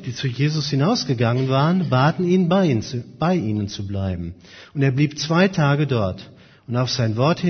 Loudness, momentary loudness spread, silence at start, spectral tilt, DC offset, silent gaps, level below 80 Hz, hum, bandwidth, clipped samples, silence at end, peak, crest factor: -20 LUFS; 9 LU; 0 s; -6.5 dB/octave; under 0.1%; none; -52 dBFS; none; 6.6 kHz; under 0.1%; 0 s; -4 dBFS; 16 dB